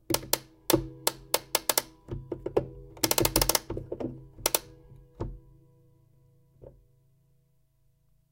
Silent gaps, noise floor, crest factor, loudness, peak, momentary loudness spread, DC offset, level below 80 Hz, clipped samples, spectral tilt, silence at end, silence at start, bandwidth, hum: none; -67 dBFS; 28 dB; -28 LUFS; -4 dBFS; 17 LU; under 0.1%; -48 dBFS; under 0.1%; -2.5 dB/octave; 1.6 s; 0.1 s; 17 kHz; none